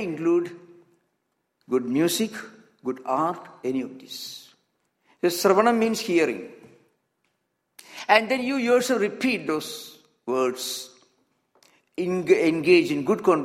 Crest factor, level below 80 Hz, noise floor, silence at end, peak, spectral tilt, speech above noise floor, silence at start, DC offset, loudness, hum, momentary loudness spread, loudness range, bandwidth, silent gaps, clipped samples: 24 dB; -72 dBFS; -76 dBFS; 0 s; -2 dBFS; -4.5 dB/octave; 53 dB; 0 s; under 0.1%; -23 LUFS; none; 17 LU; 4 LU; 16 kHz; none; under 0.1%